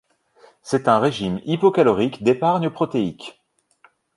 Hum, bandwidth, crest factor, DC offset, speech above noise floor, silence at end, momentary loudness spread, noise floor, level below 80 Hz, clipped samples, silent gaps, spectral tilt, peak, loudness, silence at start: none; 11.5 kHz; 20 dB; under 0.1%; 38 dB; 0.85 s; 10 LU; -58 dBFS; -58 dBFS; under 0.1%; none; -6.5 dB/octave; -2 dBFS; -20 LUFS; 0.65 s